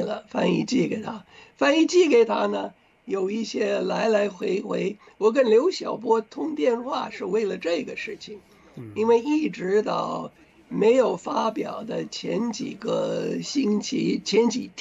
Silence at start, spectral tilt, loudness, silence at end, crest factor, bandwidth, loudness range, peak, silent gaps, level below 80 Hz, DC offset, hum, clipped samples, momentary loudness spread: 0 s; -5 dB/octave; -24 LUFS; 0 s; 16 dB; 8 kHz; 4 LU; -8 dBFS; none; -68 dBFS; under 0.1%; none; under 0.1%; 12 LU